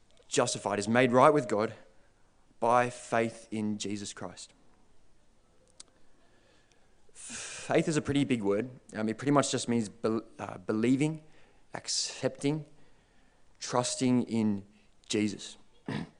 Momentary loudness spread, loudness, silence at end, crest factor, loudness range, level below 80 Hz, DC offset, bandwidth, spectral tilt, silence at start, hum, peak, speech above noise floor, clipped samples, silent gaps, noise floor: 15 LU; -30 LUFS; 0.15 s; 24 dB; 13 LU; -66 dBFS; under 0.1%; 10.5 kHz; -4.5 dB/octave; 0.3 s; none; -8 dBFS; 33 dB; under 0.1%; none; -62 dBFS